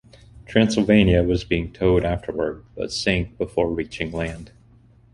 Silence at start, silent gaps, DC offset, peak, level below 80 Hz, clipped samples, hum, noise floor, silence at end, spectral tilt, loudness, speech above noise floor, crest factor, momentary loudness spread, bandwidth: 0.35 s; none; under 0.1%; -2 dBFS; -36 dBFS; under 0.1%; none; -52 dBFS; 0.65 s; -6 dB/octave; -22 LUFS; 31 dB; 20 dB; 12 LU; 11.5 kHz